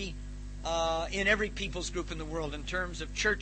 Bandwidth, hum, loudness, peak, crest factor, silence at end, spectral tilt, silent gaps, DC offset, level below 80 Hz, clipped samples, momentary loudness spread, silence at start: 8.8 kHz; 50 Hz at -40 dBFS; -32 LUFS; -14 dBFS; 18 dB; 0 s; -3.5 dB/octave; none; under 0.1%; -42 dBFS; under 0.1%; 12 LU; 0 s